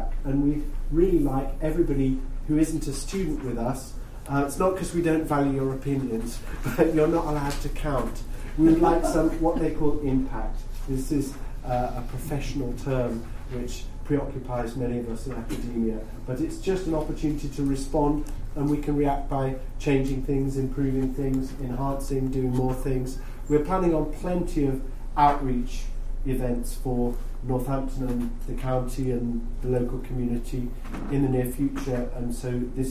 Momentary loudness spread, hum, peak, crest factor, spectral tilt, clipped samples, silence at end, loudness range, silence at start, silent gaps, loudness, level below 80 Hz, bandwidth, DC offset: 11 LU; none; -6 dBFS; 20 dB; -7 dB/octave; under 0.1%; 0 s; 6 LU; 0 s; none; -27 LUFS; -32 dBFS; 15.5 kHz; under 0.1%